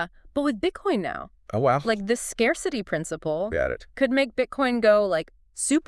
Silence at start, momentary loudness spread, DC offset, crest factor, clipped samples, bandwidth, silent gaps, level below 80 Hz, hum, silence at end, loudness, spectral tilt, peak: 0 s; 8 LU; under 0.1%; 18 dB; under 0.1%; 12 kHz; none; -50 dBFS; none; 0.05 s; -25 LUFS; -4.5 dB/octave; -8 dBFS